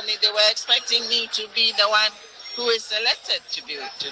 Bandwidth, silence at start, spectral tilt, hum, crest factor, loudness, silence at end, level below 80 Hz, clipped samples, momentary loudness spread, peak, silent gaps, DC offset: 10 kHz; 0 s; 1.5 dB/octave; none; 20 dB; -20 LUFS; 0 s; -74 dBFS; under 0.1%; 12 LU; -4 dBFS; none; under 0.1%